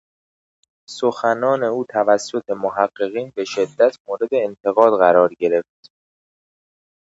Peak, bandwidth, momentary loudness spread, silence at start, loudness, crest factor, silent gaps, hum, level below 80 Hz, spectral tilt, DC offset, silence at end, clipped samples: 0 dBFS; 8 kHz; 11 LU; 0.9 s; -18 LUFS; 20 dB; 4.00-4.05 s; none; -70 dBFS; -5 dB/octave; under 0.1%; 1.4 s; under 0.1%